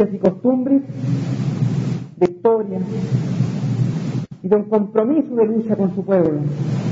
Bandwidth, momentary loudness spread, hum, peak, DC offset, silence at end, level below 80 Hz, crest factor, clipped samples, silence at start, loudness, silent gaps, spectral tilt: 7.8 kHz; 6 LU; none; -2 dBFS; under 0.1%; 0 s; -54 dBFS; 16 dB; under 0.1%; 0 s; -19 LUFS; none; -9.5 dB/octave